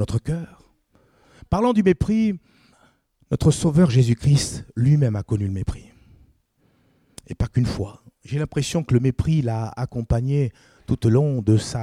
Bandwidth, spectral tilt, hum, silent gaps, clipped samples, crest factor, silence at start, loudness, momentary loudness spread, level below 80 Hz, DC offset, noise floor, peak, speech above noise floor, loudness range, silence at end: 12.5 kHz; -7 dB/octave; none; none; under 0.1%; 16 dB; 0 s; -21 LUFS; 12 LU; -40 dBFS; under 0.1%; -63 dBFS; -6 dBFS; 43 dB; 7 LU; 0 s